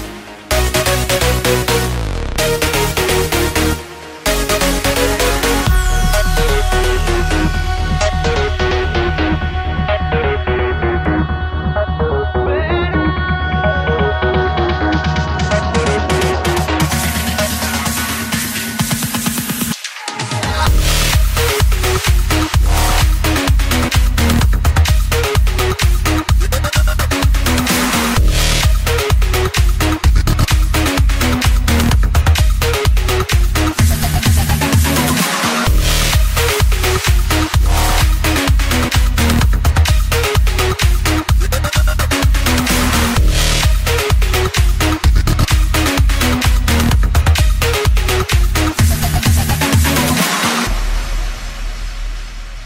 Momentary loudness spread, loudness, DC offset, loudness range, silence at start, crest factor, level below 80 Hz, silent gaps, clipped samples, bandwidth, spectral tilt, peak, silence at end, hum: 4 LU; -15 LUFS; under 0.1%; 3 LU; 0 s; 14 dB; -16 dBFS; none; under 0.1%; 16.5 kHz; -4.5 dB/octave; 0 dBFS; 0 s; none